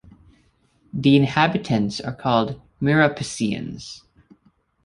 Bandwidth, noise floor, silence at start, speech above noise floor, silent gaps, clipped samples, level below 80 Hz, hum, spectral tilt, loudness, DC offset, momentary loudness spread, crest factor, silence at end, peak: 11.5 kHz; -62 dBFS; 0.95 s; 41 dB; none; under 0.1%; -54 dBFS; none; -6 dB/octave; -21 LUFS; under 0.1%; 17 LU; 20 dB; 0.85 s; -2 dBFS